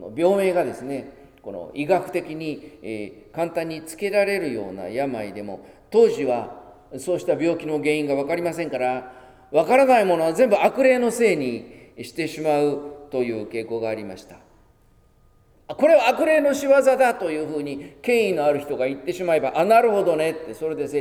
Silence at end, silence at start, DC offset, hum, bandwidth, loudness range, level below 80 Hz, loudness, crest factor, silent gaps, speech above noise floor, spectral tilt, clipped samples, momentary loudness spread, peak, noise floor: 0 s; 0 s; under 0.1%; none; 16 kHz; 8 LU; -60 dBFS; -21 LUFS; 18 dB; none; 35 dB; -5 dB/octave; under 0.1%; 17 LU; -4 dBFS; -57 dBFS